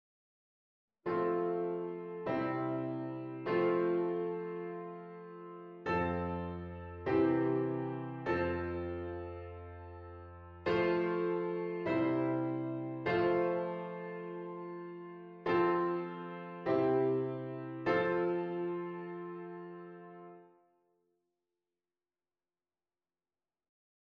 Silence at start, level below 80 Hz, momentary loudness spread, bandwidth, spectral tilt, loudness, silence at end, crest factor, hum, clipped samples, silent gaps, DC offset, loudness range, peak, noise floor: 1.05 s; -64 dBFS; 17 LU; 5.4 kHz; -9 dB/octave; -35 LUFS; 3.55 s; 18 dB; none; under 0.1%; none; under 0.1%; 5 LU; -18 dBFS; under -90 dBFS